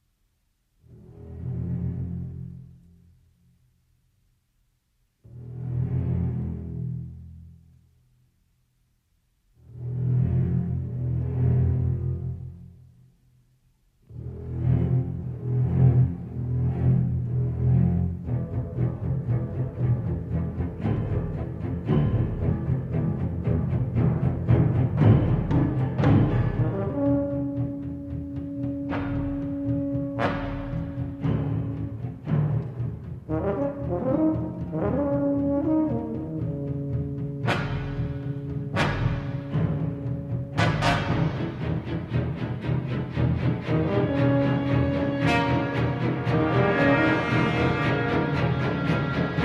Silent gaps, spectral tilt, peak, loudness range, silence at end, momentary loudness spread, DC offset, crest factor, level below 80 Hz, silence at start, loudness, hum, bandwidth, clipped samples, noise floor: none; -8.5 dB/octave; -6 dBFS; 10 LU; 0 s; 11 LU; under 0.1%; 20 dB; -40 dBFS; 0.9 s; -26 LUFS; none; 7.4 kHz; under 0.1%; -70 dBFS